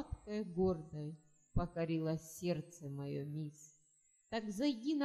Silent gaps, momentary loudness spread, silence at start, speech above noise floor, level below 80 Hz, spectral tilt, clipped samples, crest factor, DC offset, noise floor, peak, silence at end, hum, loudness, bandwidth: none; 12 LU; 0 s; 34 dB; -54 dBFS; -6.5 dB/octave; under 0.1%; 18 dB; under 0.1%; -73 dBFS; -22 dBFS; 0 s; none; -41 LUFS; 14 kHz